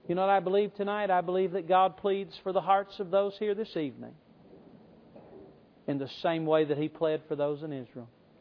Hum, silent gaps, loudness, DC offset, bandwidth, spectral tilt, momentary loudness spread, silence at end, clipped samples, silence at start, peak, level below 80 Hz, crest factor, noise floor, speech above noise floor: none; none; -30 LUFS; under 0.1%; 5.4 kHz; -8.5 dB/octave; 13 LU; 0.35 s; under 0.1%; 0.05 s; -12 dBFS; -74 dBFS; 18 dB; -55 dBFS; 26 dB